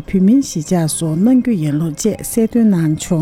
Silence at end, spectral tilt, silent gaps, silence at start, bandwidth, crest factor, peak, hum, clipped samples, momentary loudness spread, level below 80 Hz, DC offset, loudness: 0 s; -6.5 dB/octave; none; 0 s; 16 kHz; 12 dB; -4 dBFS; none; under 0.1%; 5 LU; -42 dBFS; under 0.1%; -15 LUFS